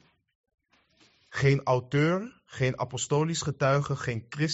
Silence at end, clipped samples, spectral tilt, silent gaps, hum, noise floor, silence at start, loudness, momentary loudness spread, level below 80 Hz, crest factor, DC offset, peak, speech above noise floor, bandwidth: 0 s; under 0.1%; -5.5 dB/octave; none; none; -64 dBFS; 1.3 s; -28 LUFS; 7 LU; -60 dBFS; 16 dB; under 0.1%; -12 dBFS; 38 dB; 8 kHz